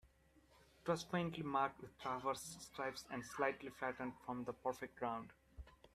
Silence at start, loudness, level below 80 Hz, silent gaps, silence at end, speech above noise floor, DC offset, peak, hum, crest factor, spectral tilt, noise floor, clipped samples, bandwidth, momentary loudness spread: 0.05 s; -44 LUFS; -70 dBFS; none; 0.05 s; 27 dB; under 0.1%; -24 dBFS; none; 20 dB; -5 dB/octave; -71 dBFS; under 0.1%; 15.5 kHz; 9 LU